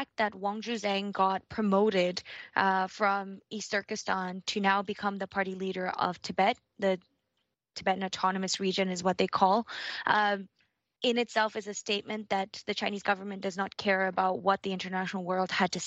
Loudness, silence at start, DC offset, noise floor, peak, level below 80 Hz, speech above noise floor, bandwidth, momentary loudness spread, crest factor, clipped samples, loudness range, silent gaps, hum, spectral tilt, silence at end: -30 LUFS; 0 s; under 0.1%; -81 dBFS; -10 dBFS; -70 dBFS; 51 dB; 8.4 kHz; 7 LU; 22 dB; under 0.1%; 3 LU; none; none; -4 dB/octave; 0 s